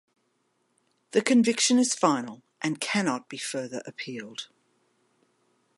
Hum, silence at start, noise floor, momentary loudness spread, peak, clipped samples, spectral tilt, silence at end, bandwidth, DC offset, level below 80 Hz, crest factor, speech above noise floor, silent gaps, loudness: none; 1.15 s; -73 dBFS; 16 LU; -8 dBFS; under 0.1%; -3 dB/octave; 1.3 s; 11.5 kHz; under 0.1%; -82 dBFS; 22 dB; 47 dB; none; -26 LUFS